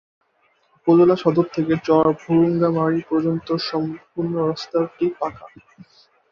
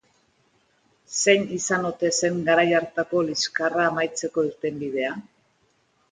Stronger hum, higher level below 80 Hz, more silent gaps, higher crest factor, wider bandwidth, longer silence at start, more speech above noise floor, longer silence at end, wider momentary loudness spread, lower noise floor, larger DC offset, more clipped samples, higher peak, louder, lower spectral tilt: neither; first, -58 dBFS vs -66 dBFS; neither; about the same, 16 dB vs 20 dB; second, 6.8 kHz vs 9.6 kHz; second, 0.85 s vs 1.1 s; about the same, 44 dB vs 43 dB; about the same, 0.85 s vs 0.9 s; first, 11 LU vs 8 LU; about the same, -63 dBFS vs -66 dBFS; neither; neither; about the same, -4 dBFS vs -6 dBFS; first, -20 LUFS vs -23 LUFS; first, -8 dB/octave vs -3 dB/octave